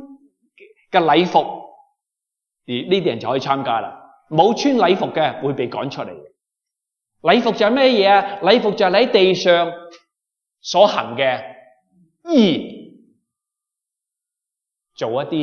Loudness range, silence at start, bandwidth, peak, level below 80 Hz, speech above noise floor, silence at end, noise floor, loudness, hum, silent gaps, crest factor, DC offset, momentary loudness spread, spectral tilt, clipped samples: 7 LU; 0 s; 7 kHz; 0 dBFS; -70 dBFS; 68 dB; 0 s; -84 dBFS; -17 LUFS; none; none; 18 dB; under 0.1%; 14 LU; -5 dB/octave; under 0.1%